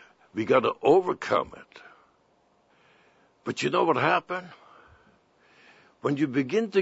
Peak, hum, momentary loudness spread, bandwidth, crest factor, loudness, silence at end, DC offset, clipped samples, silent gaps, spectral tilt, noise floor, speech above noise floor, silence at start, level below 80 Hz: -6 dBFS; none; 16 LU; 8 kHz; 22 dB; -25 LUFS; 0 s; under 0.1%; under 0.1%; none; -6 dB/octave; -65 dBFS; 40 dB; 0.35 s; -70 dBFS